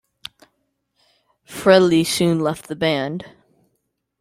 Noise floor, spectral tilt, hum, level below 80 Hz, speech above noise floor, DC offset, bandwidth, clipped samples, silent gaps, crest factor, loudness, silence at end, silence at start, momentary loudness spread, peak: -73 dBFS; -5 dB/octave; none; -58 dBFS; 55 dB; under 0.1%; 15.5 kHz; under 0.1%; none; 20 dB; -18 LUFS; 0.95 s; 1.5 s; 24 LU; -2 dBFS